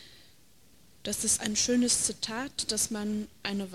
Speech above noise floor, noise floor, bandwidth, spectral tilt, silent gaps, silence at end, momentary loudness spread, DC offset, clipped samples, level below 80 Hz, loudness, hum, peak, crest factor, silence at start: 31 dB; -62 dBFS; 15.5 kHz; -2 dB/octave; none; 0 s; 10 LU; 0.1%; under 0.1%; -60 dBFS; -28 LUFS; none; -14 dBFS; 18 dB; 0 s